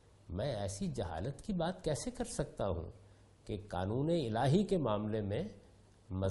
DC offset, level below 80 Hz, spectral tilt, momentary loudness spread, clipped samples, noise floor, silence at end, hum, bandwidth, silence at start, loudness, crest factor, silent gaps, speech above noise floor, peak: under 0.1%; -56 dBFS; -6.5 dB/octave; 13 LU; under 0.1%; -62 dBFS; 0 s; none; 11.5 kHz; 0.25 s; -37 LUFS; 18 dB; none; 26 dB; -18 dBFS